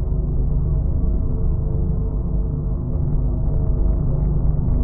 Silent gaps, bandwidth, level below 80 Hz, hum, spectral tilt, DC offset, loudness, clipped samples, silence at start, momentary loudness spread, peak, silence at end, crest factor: none; 1.5 kHz; -20 dBFS; none; -16.5 dB/octave; under 0.1%; -22 LUFS; under 0.1%; 0 s; 3 LU; -6 dBFS; 0 s; 14 dB